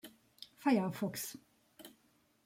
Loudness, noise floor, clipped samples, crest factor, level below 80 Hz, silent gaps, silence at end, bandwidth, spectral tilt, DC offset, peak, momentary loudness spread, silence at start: -36 LUFS; -72 dBFS; under 0.1%; 20 dB; -80 dBFS; none; 0.55 s; 16.5 kHz; -5 dB/octave; under 0.1%; -18 dBFS; 24 LU; 0.05 s